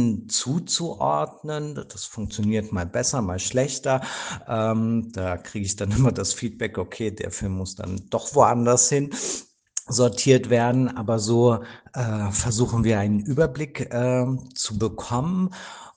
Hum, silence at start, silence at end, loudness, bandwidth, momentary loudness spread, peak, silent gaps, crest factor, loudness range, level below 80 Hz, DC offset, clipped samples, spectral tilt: none; 0 s; 0.05 s; -24 LUFS; 10 kHz; 12 LU; -2 dBFS; none; 20 dB; 5 LU; -48 dBFS; under 0.1%; under 0.1%; -5 dB/octave